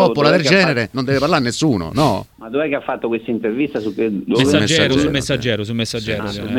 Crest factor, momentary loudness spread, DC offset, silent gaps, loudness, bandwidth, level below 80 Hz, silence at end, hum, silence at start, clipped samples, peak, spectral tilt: 16 dB; 9 LU; under 0.1%; none; -17 LUFS; 16.5 kHz; -44 dBFS; 0 s; none; 0 s; under 0.1%; 0 dBFS; -5 dB/octave